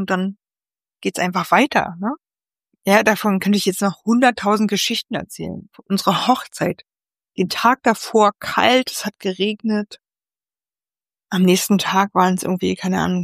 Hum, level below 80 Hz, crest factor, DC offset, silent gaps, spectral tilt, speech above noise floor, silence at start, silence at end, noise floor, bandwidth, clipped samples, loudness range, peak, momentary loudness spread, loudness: none; -60 dBFS; 18 dB; under 0.1%; none; -4.5 dB/octave; over 72 dB; 0 s; 0 s; under -90 dBFS; 15.5 kHz; under 0.1%; 3 LU; 0 dBFS; 12 LU; -18 LUFS